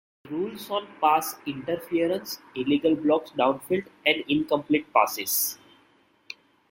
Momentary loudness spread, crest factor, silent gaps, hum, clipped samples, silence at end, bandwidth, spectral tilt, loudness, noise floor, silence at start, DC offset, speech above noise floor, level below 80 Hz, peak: 12 LU; 22 dB; none; none; under 0.1%; 1.15 s; 16.5 kHz; -3.5 dB/octave; -26 LUFS; -62 dBFS; 0.25 s; under 0.1%; 37 dB; -68 dBFS; -6 dBFS